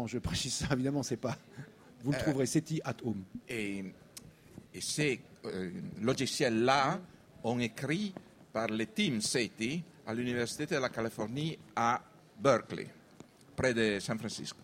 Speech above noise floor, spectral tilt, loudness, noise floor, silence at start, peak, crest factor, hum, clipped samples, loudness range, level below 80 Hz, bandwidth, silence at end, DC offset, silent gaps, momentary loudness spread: 24 dB; -4.5 dB/octave; -34 LUFS; -57 dBFS; 0 s; -14 dBFS; 22 dB; none; under 0.1%; 4 LU; -60 dBFS; 16 kHz; 0 s; under 0.1%; none; 13 LU